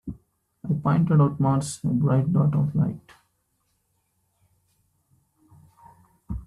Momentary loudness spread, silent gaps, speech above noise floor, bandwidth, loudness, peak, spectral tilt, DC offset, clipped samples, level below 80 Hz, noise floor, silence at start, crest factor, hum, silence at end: 18 LU; none; 50 dB; 12 kHz; -23 LUFS; -8 dBFS; -8 dB/octave; under 0.1%; under 0.1%; -50 dBFS; -72 dBFS; 0.05 s; 16 dB; none; 0 s